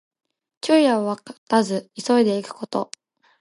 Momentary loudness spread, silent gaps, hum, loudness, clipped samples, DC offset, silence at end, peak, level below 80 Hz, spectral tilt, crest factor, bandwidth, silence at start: 13 LU; 1.38-1.47 s; none; -21 LUFS; under 0.1%; under 0.1%; 0.55 s; -6 dBFS; -76 dBFS; -5 dB/octave; 18 dB; 11.5 kHz; 0.65 s